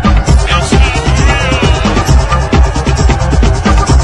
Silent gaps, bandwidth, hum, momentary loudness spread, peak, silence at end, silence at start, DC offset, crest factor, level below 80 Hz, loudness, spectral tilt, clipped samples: none; 12 kHz; none; 2 LU; 0 dBFS; 0 s; 0 s; under 0.1%; 8 dB; -10 dBFS; -10 LUFS; -5.5 dB/octave; 0.2%